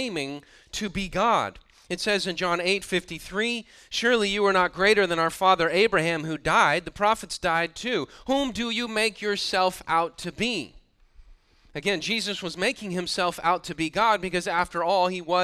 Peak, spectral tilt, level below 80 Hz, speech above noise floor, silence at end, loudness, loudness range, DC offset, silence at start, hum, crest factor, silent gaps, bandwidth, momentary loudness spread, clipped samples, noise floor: -6 dBFS; -3.5 dB/octave; -52 dBFS; 29 dB; 0 s; -25 LUFS; 6 LU; under 0.1%; 0 s; none; 20 dB; none; 15 kHz; 10 LU; under 0.1%; -54 dBFS